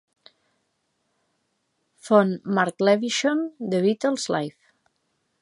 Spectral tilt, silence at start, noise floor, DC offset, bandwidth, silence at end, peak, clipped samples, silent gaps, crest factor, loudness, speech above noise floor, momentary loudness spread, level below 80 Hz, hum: -5 dB/octave; 2.05 s; -73 dBFS; under 0.1%; 11.5 kHz; 0.9 s; -2 dBFS; under 0.1%; none; 22 dB; -23 LUFS; 51 dB; 7 LU; -76 dBFS; none